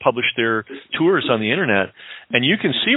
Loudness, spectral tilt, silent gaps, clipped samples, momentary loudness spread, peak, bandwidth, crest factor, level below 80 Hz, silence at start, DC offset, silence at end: -19 LUFS; -10 dB/octave; none; under 0.1%; 9 LU; 0 dBFS; 4.1 kHz; 18 dB; -64 dBFS; 0 s; under 0.1%; 0 s